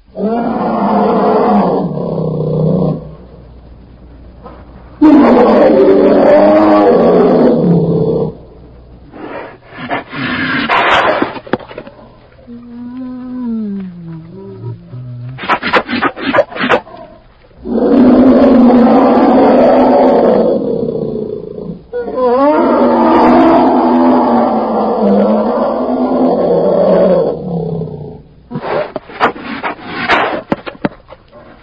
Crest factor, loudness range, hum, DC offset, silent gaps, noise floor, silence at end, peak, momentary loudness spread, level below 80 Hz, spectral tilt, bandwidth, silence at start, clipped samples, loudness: 12 dB; 10 LU; none; under 0.1%; none; -40 dBFS; 0.25 s; 0 dBFS; 20 LU; -40 dBFS; -8.5 dB/octave; 6.6 kHz; 0.15 s; under 0.1%; -10 LUFS